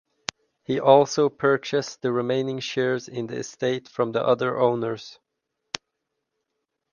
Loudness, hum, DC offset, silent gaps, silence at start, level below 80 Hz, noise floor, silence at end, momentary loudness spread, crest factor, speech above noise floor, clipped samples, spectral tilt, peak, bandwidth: -23 LUFS; none; under 0.1%; none; 0.7 s; -70 dBFS; -80 dBFS; 1.8 s; 18 LU; 24 dB; 57 dB; under 0.1%; -5 dB/octave; 0 dBFS; 7.4 kHz